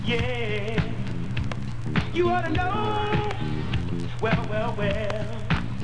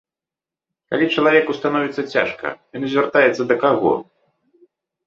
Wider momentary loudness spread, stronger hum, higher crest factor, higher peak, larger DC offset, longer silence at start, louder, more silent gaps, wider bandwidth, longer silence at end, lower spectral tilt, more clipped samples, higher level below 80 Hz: second, 6 LU vs 10 LU; neither; about the same, 16 dB vs 18 dB; second, -10 dBFS vs 0 dBFS; first, 3% vs under 0.1%; second, 0 s vs 0.9 s; second, -27 LUFS vs -18 LUFS; neither; first, 10 kHz vs 7.4 kHz; second, 0 s vs 1.05 s; about the same, -7 dB/octave vs -6 dB/octave; neither; first, -38 dBFS vs -62 dBFS